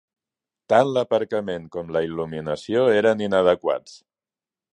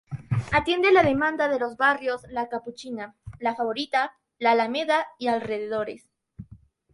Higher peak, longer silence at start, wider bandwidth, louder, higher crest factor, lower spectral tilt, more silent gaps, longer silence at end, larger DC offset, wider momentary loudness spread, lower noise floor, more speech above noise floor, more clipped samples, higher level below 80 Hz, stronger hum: first, -4 dBFS vs -8 dBFS; first, 0.7 s vs 0.1 s; second, 10 kHz vs 11.5 kHz; about the same, -22 LUFS vs -24 LUFS; about the same, 20 dB vs 18 dB; about the same, -6 dB/octave vs -6 dB/octave; neither; first, 0.75 s vs 0.4 s; neither; second, 11 LU vs 16 LU; first, under -90 dBFS vs -52 dBFS; first, over 69 dB vs 28 dB; neither; about the same, -58 dBFS vs -54 dBFS; neither